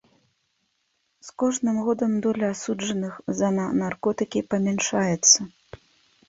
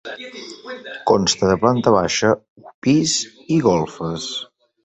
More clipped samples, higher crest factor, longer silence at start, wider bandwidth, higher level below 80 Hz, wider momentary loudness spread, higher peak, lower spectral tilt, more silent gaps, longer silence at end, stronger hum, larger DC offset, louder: neither; about the same, 20 dB vs 18 dB; first, 1.25 s vs 0.05 s; about the same, 8 kHz vs 8.4 kHz; second, -62 dBFS vs -48 dBFS; second, 11 LU vs 17 LU; about the same, -4 dBFS vs -2 dBFS; about the same, -3.5 dB/octave vs -4.5 dB/octave; second, none vs 2.50-2.56 s, 2.74-2.82 s; first, 0.8 s vs 0.4 s; neither; neither; second, -23 LUFS vs -18 LUFS